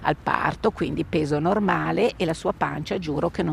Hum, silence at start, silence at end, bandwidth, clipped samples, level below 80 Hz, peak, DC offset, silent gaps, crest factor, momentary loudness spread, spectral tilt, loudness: none; 0 s; 0 s; 14.5 kHz; under 0.1%; -46 dBFS; -4 dBFS; under 0.1%; none; 20 dB; 5 LU; -6.5 dB/octave; -24 LUFS